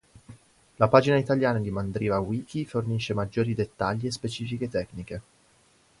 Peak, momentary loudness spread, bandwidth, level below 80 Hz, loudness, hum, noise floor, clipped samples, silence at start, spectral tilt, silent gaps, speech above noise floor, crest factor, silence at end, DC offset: -2 dBFS; 12 LU; 11.5 kHz; -52 dBFS; -27 LUFS; none; -62 dBFS; under 0.1%; 0.3 s; -6.5 dB/octave; none; 36 dB; 24 dB; 0.8 s; under 0.1%